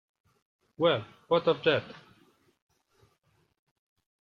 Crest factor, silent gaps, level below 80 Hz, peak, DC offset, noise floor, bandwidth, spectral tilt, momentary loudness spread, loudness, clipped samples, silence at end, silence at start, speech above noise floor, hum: 22 dB; none; -74 dBFS; -12 dBFS; under 0.1%; -71 dBFS; 6.2 kHz; -7 dB/octave; 7 LU; -28 LUFS; under 0.1%; 2.3 s; 0.8 s; 44 dB; none